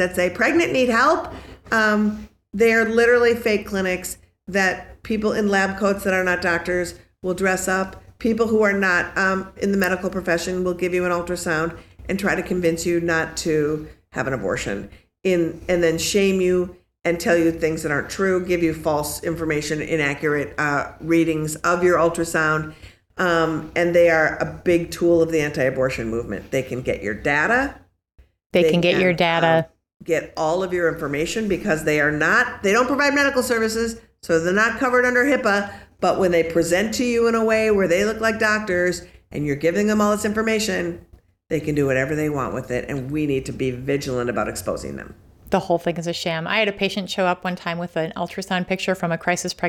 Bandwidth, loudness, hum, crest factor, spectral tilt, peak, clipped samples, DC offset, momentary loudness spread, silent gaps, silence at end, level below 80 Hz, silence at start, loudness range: 15.5 kHz; -21 LUFS; none; 14 dB; -5 dB/octave; -6 dBFS; under 0.1%; under 0.1%; 9 LU; 28.46-28.50 s, 29.96-30.00 s; 0 s; -46 dBFS; 0 s; 4 LU